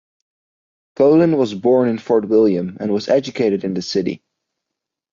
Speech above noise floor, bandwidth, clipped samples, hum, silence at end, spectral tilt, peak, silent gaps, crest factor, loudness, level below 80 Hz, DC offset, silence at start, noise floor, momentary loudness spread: 66 dB; 7.4 kHz; under 0.1%; none; 0.95 s; -7 dB/octave; -4 dBFS; none; 14 dB; -17 LUFS; -60 dBFS; under 0.1%; 1 s; -82 dBFS; 8 LU